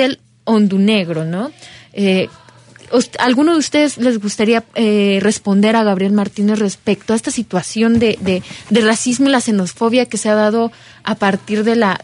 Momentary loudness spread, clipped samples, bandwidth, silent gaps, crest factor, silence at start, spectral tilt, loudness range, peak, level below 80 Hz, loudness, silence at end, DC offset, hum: 7 LU; under 0.1%; 11 kHz; none; 12 dB; 0 s; -5 dB/octave; 2 LU; -2 dBFS; -54 dBFS; -15 LUFS; 0.05 s; under 0.1%; none